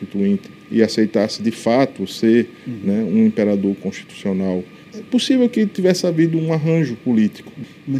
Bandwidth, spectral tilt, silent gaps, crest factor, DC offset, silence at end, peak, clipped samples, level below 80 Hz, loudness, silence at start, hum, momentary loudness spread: 13.5 kHz; -6.5 dB/octave; none; 18 dB; under 0.1%; 0 s; 0 dBFS; under 0.1%; -64 dBFS; -18 LUFS; 0 s; none; 11 LU